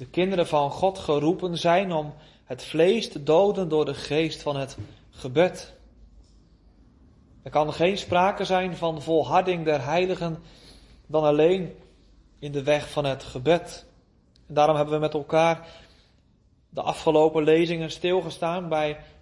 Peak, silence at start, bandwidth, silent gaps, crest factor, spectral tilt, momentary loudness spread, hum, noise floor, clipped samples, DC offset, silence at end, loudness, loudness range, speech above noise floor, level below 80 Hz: -6 dBFS; 0 s; 11.5 kHz; none; 18 dB; -6 dB/octave; 13 LU; none; -61 dBFS; under 0.1%; under 0.1%; 0.15 s; -24 LUFS; 4 LU; 37 dB; -54 dBFS